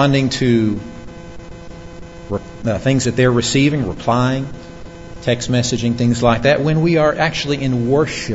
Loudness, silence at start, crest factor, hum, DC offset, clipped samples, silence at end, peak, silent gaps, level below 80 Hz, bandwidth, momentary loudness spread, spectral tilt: -16 LUFS; 0 s; 16 dB; none; 0.8%; under 0.1%; 0 s; 0 dBFS; none; -38 dBFS; 8 kHz; 21 LU; -5.5 dB/octave